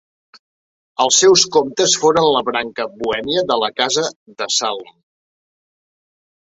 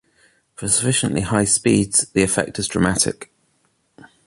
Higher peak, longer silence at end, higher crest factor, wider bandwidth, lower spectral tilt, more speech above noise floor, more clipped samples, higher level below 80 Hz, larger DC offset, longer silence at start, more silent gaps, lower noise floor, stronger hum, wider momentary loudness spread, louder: about the same, 0 dBFS vs -2 dBFS; first, 1.65 s vs 1 s; about the same, 18 dB vs 20 dB; second, 8 kHz vs 12 kHz; second, -1.5 dB/octave vs -3.5 dB/octave; first, over 74 dB vs 46 dB; neither; second, -58 dBFS vs -44 dBFS; neither; first, 1 s vs 0.6 s; first, 4.16-4.26 s vs none; first, under -90 dBFS vs -65 dBFS; neither; first, 14 LU vs 6 LU; first, -15 LUFS vs -18 LUFS